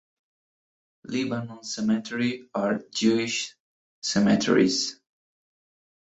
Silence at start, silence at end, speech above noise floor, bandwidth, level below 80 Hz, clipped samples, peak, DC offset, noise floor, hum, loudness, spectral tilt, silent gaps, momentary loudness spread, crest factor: 1.05 s; 1.2 s; over 65 dB; 8.2 kHz; -64 dBFS; under 0.1%; -8 dBFS; under 0.1%; under -90 dBFS; none; -25 LUFS; -4 dB/octave; 3.60-4.02 s; 12 LU; 20 dB